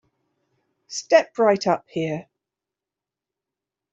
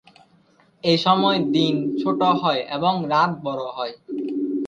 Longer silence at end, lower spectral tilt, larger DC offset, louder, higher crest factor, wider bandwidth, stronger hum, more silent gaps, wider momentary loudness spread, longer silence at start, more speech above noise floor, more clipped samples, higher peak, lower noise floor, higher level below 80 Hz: first, 1.7 s vs 0 s; second, -4.5 dB/octave vs -6.5 dB/octave; neither; about the same, -21 LUFS vs -21 LUFS; about the same, 22 dB vs 18 dB; about the same, 8 kHz vs 8.6 kHz; neither; neither; first, 15 LU vs 11 LU; about the same, 0.9 s vs 0.85 s; first, 68 dB vs 37 dB; neither; about the same, -2 dBFS vs -4 dBFS; first, -88 dBFS vs -57 dBFS; about the same, -70 dBFS vs -66 dBFS